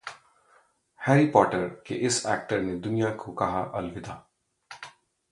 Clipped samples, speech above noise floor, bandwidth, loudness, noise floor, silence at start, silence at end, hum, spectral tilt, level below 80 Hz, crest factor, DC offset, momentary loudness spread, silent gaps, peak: under 0.1%; 37 dB; 11.5 kHz; -26 LUFS; -63 dBFS; 0.05 s; 0.45 s; none; -5 dB/octave; -58 dBFS; 24 dB; under 0.1%; 22 LU; none; -4 dBFS